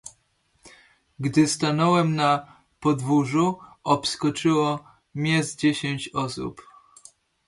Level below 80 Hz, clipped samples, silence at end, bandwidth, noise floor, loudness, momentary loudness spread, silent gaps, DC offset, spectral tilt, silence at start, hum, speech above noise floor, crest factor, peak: -62 dBFS; under 0.1%; 0.85 s; 11.5 kHz; -67 dBFS; -23 LUFS; 12 LU; none; under 0.1%; -5 dB/octave; 0.05 s; none; 44 dB; 18 dB; -6 dBFS